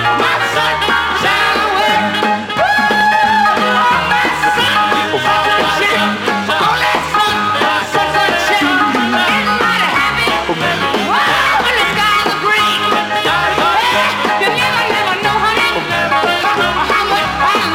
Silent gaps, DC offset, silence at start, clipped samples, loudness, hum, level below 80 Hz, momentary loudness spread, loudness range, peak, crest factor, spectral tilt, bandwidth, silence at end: none; under 0.1%; 0 s; under 0.1%; -12 LUFS; none; -40 dBFS; 3 LU; 1 LU; 0 dBFS; 12 dB; -3 dB/octave; 17.5 kHz; 0 s